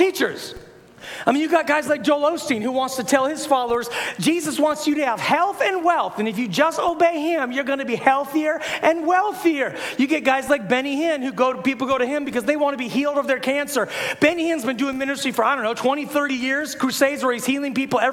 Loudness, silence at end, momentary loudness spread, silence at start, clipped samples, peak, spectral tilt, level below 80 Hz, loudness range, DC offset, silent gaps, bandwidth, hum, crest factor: -21 LUFS; 0 s; 4 LU; 0 s; under 0.1%; -2 dBFS; -3.5 dB/octave; -60 dBFS; 1 LU; under 0.1%; none; 17 kHz; none; 20 dB